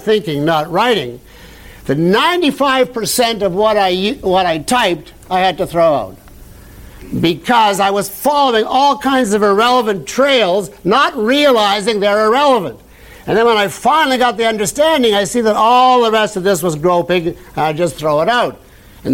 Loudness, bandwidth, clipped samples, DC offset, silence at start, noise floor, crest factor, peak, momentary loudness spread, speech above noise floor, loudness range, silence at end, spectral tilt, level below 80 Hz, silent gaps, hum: -13 LUFS; 17 kHz; under 0.1%; under 0.1%; 0 s; -37 dBFS; 12 dB; -2 dBFS; 7 LU; 24 dB; 3 LU; 0 s; -4 dB/octave; -44 dBFS; none; none